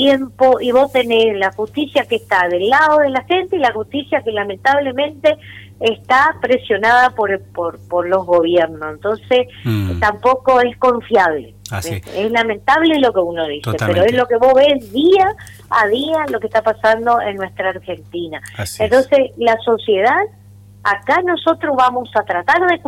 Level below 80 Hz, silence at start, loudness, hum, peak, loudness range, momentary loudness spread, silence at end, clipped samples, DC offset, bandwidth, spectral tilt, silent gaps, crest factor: -48 dBFS; 0 s; -15 LUFS; 50 Hz at -45 dBFS; -4 dBFS; 3 LU; 10 LU; 0 s; under 0.1%; under 0.1%; 16 kHz; -5.5 dB/octave; none; 12 dB